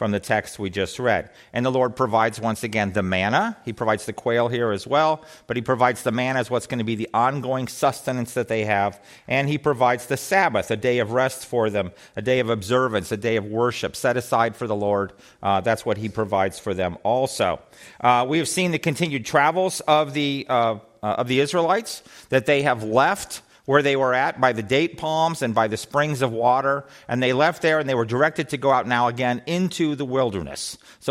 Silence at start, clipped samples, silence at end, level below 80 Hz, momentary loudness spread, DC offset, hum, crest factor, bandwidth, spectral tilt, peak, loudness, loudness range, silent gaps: 0 s; under 0.1%; 0 s; -58 dBFS; 7 LU; under 0.1%; none; 18 dB; 16 kHz; -5 dB/octave; -4 dBFS; -22 LUFS; 2 LU; none